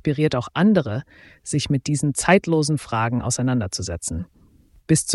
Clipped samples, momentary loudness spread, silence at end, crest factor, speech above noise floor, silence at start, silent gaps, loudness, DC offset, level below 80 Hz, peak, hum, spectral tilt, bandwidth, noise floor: under 0.1%; 12 LU; 0 s; 18 dB; 33 dB; 0.05 s; none; -21 LUFS; under 0.1%; -46 dBFS; -4 dBFS; none; -5 dB/octave; 12 kHz; -54 dBFS